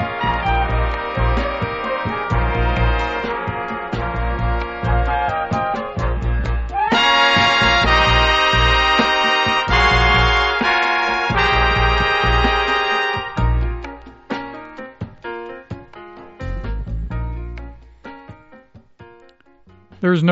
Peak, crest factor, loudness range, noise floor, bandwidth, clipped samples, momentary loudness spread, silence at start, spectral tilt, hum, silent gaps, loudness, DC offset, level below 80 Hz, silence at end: -2 dBFS; 16 dB; 17 LU; -50 dBFS; 8 kHz; under 0.1%; 18 LU; 0 s; -2.5 dB/octave; none; none; -17 LUFS; 0.2%; -24 dBFS; 0 s